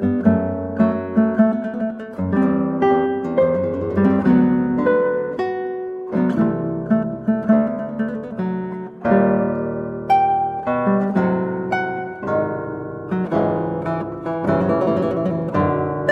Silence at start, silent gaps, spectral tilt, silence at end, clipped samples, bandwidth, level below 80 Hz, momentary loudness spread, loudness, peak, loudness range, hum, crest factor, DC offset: 0 s; none; -10 dB/octave; 0 s; under 0.1%; 5.8 kHz; -50 dBFS; 9 LU; -20 LUFS; -2 dBFS; 3 LU; none; 16 dB; under 0.1%